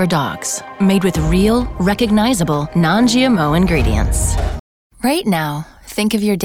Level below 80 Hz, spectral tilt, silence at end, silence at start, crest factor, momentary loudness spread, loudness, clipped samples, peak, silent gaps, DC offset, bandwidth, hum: -26 dBFS; -5 dB/octave; 0 s; 0 s; 12 dB; 8 LU; -16 LUFS; under 0.1%; -4 dBFS; 4.60-4.90 s; under 0.1%; 18.5 kHz; none